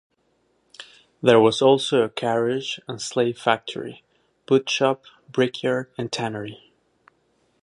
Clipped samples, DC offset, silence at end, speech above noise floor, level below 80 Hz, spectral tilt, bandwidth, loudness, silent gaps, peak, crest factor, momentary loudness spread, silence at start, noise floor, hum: under 0.1%; under 0.1%; 1.1 s; 46 dB; -68 dBFS; -4.5 dB/octave; 11 kHz; -22 LUFS; none; -2 dBFS; 20 dB; 17 LU; 0.8 s; -67 dBFS; none